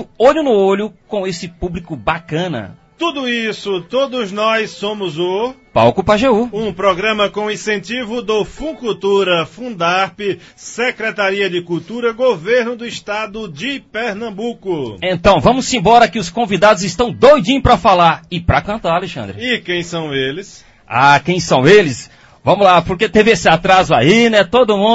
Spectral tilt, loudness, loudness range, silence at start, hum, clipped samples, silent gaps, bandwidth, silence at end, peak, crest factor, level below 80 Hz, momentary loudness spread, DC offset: -5 dB/octave; -14 LUFS; 7 LU; 0 s; none; under 0.1%; none; 8 kHz; 0 s; 0 dBFS; 14 dB; -38 dBFS; 12 LU; under 0.1%